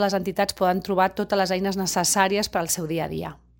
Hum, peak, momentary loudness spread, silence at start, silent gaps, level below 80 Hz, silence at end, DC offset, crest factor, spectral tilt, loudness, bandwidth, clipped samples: none; -4 dBFS; 7 LU; 0 s; none; -52 dBFS; 0.25 s; under 0.1%; 20 dB; -3.5 dB/octave; -23 LUFS; 17 kHz; under 0.1%